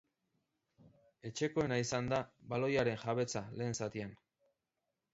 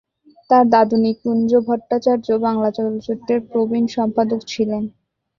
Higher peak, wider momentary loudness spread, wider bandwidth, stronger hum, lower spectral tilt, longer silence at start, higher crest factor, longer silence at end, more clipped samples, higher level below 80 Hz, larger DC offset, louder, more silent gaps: second, -20 dBFS vs -2 dBFS; first, 11 LU vs 8 LU; about the same, 7.6 kHz vs 7.2 kHz; neither; second, -5 dB/octave vs -6.5 dB/octave; first, 0.85 s vs 0.5 s; about the same, 18 dB vs 16 dB; first, 1 s vs 0.5 s; neither; second, -68 dBFS vs -58 dBFS; neither; second, -37 LUFS vs -18 LUFS; neither